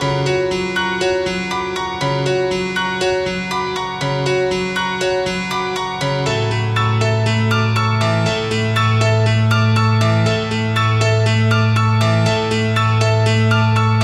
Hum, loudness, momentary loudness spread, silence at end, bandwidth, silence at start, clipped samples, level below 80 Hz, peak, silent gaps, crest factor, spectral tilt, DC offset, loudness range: none; -17 LUFS; 6 LU; 0 s; 11.5 kHz; 0 s; under 0.1%; -44 dBFS; -4 dBFS; none; 12 dB; -5.5 dB/octave; under 0.1%; 4 LU